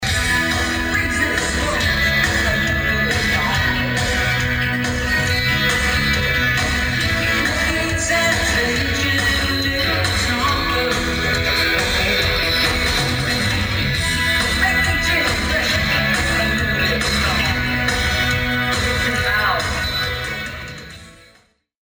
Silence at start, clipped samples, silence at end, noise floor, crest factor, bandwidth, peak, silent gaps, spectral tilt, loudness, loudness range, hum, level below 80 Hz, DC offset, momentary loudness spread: 0 s; under 0.1%; 0.7 s; -55 dBFS; 16 dB; over 20 kHz; -4 dBFS; none; -3.5 dB/octave; -17 LUFS; 1 LU; none; -30 dBFS; under 0.1%; 3 LU